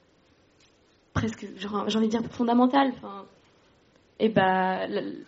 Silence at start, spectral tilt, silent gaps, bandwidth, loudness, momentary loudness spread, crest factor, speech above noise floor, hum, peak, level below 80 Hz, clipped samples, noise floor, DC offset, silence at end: 1.15 s; -4.5 dB/octave; none; 7.6 kHz; -26 LUFS; 14 LU; 20 dB; 37 dB; none; -8 dBFS; -58 dBFS; under 0.1%; -62 dBFS; under 0.1%; 0.05 s